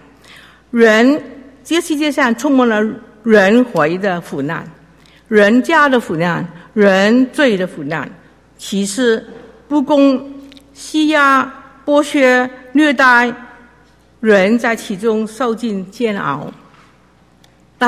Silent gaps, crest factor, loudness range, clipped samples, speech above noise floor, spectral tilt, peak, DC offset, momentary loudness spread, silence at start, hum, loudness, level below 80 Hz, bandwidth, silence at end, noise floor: none; 14 dB; 4 LU; under 0.1%; 37 dB; -5 dB/octave; 0 dBFS; under 0.1%; 13 LU; 0.75 s; none; -14 LUFS; -54 dBFS; 15 kHz; 0 s; -49 dBFS